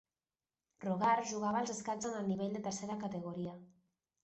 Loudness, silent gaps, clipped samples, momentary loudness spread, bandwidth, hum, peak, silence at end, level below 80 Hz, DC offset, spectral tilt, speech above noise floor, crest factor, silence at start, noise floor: -38 LUFS; none; under 0.1%; 12 LU; 8.2 kHz; none; -20 dBFS; 0.55 s; -76 dBFS; under 0.1%; -5 dB/octave; over 53 dB; 18 dB; 0.8 s; under -90 dBFS